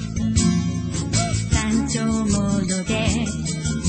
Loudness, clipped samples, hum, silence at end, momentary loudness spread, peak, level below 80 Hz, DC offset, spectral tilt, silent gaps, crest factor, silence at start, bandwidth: -21 LUFS; under 0.1%; none; 0 s; 5 LU; -6 dBFS; -32 dBFS; under 0.1%; -5 dB/octave; none; 16 dB; 0 s; 8.8 kHz